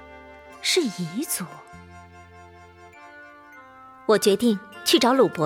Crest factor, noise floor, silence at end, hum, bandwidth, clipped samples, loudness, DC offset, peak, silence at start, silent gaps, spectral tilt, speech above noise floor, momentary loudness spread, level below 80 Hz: 18 dB; -47 dBFS; 0 s; none; 17.5 kHz; under 0.1%; -22 LUFS; under 0.1%; -6 dBFS; 0 s; none; -3.5 dB/octave; 26 dB; 26 LU; -62 dBFS